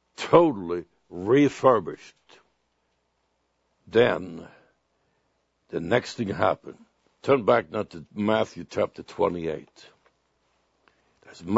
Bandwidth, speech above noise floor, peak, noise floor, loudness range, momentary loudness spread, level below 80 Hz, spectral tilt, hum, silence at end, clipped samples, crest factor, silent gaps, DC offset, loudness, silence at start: 8 kHz; 49 dB; -2 dBFS; -73 dBFS; 5 LU; 18 LU; -62 dBFS; -6.5 dB/octave; none; 0 s; under 0.1%; 24 dB; none; under 0.1%; -24 LUFS; 0.2 s